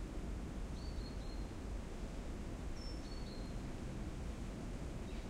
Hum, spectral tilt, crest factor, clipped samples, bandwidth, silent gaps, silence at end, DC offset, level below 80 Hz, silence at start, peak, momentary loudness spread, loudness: none; -6 dB/octave; 12 dB; under 0.1%; 14 kHz; none; 0 s; under 0.1%; -46 dBFS; 0 s; -34 dBFS; 1 LU; -47 LUFS